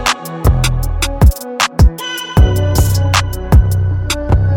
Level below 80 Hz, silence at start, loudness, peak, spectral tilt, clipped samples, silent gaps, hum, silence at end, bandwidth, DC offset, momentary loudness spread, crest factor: -16 dBFS; 0 s; -14 LUFS; 0 dBFS; -5 dB/octave; under 0.1%; none; none; 0 s; 18 kHz; under 0.1%; 5 LU; 12 dB